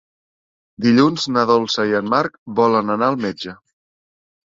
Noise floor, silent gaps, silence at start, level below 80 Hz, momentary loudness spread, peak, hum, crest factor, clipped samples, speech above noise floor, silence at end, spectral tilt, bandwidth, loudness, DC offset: under -90 dBFS; 2.38-2.46 s; 0.8 s; -60 dBFS; 9 LU; -2 dBFS; none; 18 dB; under 0.1%; over 73 dB; 1 s; -5.5 dB/octave; 7.6 kHz; -17 LUFS; under 0.1%